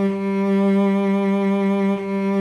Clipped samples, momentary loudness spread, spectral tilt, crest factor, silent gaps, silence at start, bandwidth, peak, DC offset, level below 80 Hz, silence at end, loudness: under 0.1%; 4 LU; -8.5 dB/octave; 10 dB; none; 0 s; 6.8 kHz; -10 dBFS; under 0.1%; -62 dBFS; 0 s; -19 LUFS